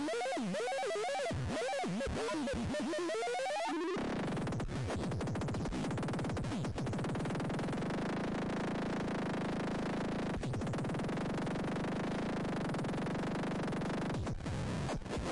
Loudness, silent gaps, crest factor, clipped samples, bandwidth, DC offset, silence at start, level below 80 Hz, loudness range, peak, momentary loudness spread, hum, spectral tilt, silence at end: -37 LUFS; none; 4 dB; under 0.1%; 11.5 kHz; 0.2%; 0 s; -52 dBFS; 1 LU; -32 dBFS; 2 LU; none; -6 dB/octave; 0 s